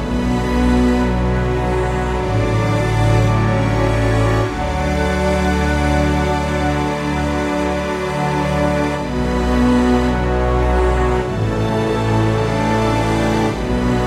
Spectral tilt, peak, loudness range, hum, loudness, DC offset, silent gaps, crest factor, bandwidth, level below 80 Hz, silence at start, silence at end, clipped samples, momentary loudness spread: -6.5 dB/octave; -4 dBFS; 1 LU; none; -17 LUFS; under 0.1%; none; 12 dB; 13.5 kHz; -24 dBFS; 0 s; 0 s; under 0.1%; 4 LU